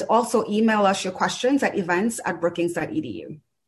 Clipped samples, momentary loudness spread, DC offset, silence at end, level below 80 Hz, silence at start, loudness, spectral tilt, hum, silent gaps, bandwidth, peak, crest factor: under 0.1%; 10 LU; under 0.1%; 0.3 s; -62 dBFS; 0 s; -23 LUFS; -4.5 dB/octave; none; none; 12.5 kHz; -6 dBFS; 16 dB